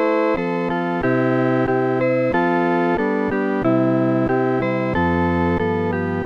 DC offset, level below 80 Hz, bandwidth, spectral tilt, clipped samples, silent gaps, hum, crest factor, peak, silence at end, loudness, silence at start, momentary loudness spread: under 0.1%; -46 dBFS; 6.6 kHz; -9 dB/octave; under 0.1%; none; none; 12 dB; -6 dBFS; 0 s; -19 LUFS; 0 s; 3 LU